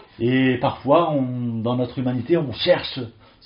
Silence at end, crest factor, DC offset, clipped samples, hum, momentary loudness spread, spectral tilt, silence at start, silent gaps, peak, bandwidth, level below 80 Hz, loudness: 0.35 s; 18 dB; under 0.1%; under 0.1%; none; 7 LU; -5 dB/octave; 0.2 s; none; -2 dBFS; 5.4 kHz; -54 dBFS; -21 LUFS